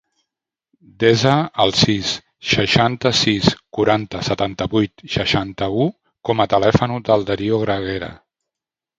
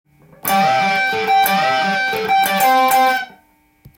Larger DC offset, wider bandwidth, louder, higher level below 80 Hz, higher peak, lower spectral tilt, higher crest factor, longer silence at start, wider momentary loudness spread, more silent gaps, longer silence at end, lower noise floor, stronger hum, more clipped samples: neither; second, 9.4 kHz vs 17 kHz; second, -18 LUFS vs -15 LUFS; first, -44 dBFS vs -58 dBFS; about the same, 0 dBFS vs -2 dBFS; first, -5 dB/octave vs -2.5 dB/octave; about the same, 18 dB vs 14 dB; first, 1 s vs 0.45 s; about the same, 8 LU vs 6 LU; neither; first, 0.85 s vs 0.1 s; first, -86 dBFS vs -54 dBFS; neither; neither